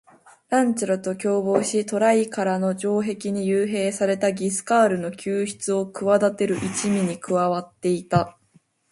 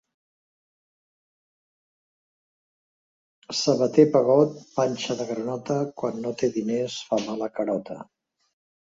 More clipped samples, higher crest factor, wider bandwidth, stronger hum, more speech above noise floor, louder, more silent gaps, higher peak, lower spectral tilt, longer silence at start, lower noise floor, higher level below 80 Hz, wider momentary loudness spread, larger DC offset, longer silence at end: neither; second, 18 dB vs 24 dB; first, 11.5 kHz vs 7.8 kHz; neither; second, 38 dB vs over 66 dB; about the same, -23 LUFS vs -24 LUFS; neither; about the same, -4 dBFS vs -4 dBFS; about the same, -5.5 dB/octave vs -5.5 dB/octave; second, 0.5 s vs 3.5 s; second, -60 dBFS vs under -90 dBFS; first, -60 dBFS vs -70 dBFS; second, 6 LU vs 12 LU; neither; second, 0.6 s vs 0.8 s